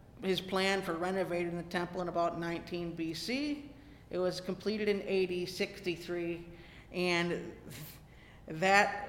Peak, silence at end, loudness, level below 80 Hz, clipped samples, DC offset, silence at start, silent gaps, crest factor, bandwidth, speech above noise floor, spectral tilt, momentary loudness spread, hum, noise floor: -12 dBFS; 0 s; -34 LUFS; -60 dBFS; under 0.1%; under 0.1%; 0 s; none; 24 dB; 17 kHz; 21 dB; -5 dB/octave; 16 LU; none; -55 dBFS